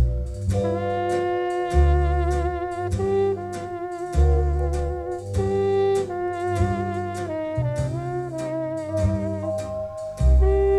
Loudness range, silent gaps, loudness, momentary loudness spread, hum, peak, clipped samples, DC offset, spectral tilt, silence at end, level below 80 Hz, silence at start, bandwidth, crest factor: 3 LU; none; -24 LUFS; 8 LU; none; -8 dBFS; under 0.1%; under 0.1%; -8 dB/octave; 0 s; -26 dBFS; 0 s; 11.5 kHz; 16 dB